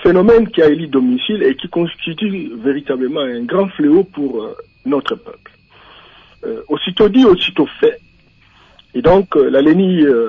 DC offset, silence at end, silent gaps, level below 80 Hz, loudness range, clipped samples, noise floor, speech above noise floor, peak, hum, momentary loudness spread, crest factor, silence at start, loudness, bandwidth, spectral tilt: under 0.1%; 0 s; none; -42 dBFS; 5 LU; under 0.1%; -49 dBFS; 36 dB; -2 dBFS; none; 15 LU; 12 dB; 0 s; -14 LUFS; 6.8 kHz; -8 dB/octave